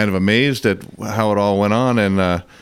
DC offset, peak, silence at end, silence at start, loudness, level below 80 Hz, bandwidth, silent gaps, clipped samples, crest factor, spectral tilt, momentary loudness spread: under 0.1%; -2 dBFS; 0.2 s; 0 s; -17 LUFS; -48 dBFS; 15.5 kHz; none; under 0.1%; 14 dB; -6 dB/octave; 6 LU